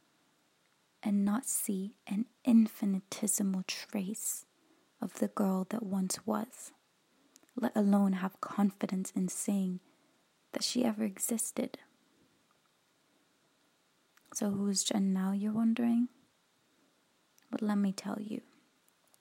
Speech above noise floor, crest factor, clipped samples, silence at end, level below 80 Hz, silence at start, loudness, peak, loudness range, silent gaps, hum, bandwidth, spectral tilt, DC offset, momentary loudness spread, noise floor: 40 dB; 18 dB; under 0.1%; 0.8 s; -84 dBFS; 1.05 s; -33 LUFS; -16 dBFS; 6 LU; none; none; 16.5 kHz; -5 dB/octave; under 0.1%; 12 LU; -72 dBFS